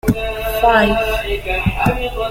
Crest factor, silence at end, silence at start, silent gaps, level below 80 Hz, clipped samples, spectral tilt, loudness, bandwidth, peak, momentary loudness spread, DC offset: 16 dB; 0 s; 0.05 s; none; -26 dBFS; under 0.1%; -6 dB/octave; -16 LUFS; 16.5 kHz; 0 dBFS; 8 LU; under 0.1%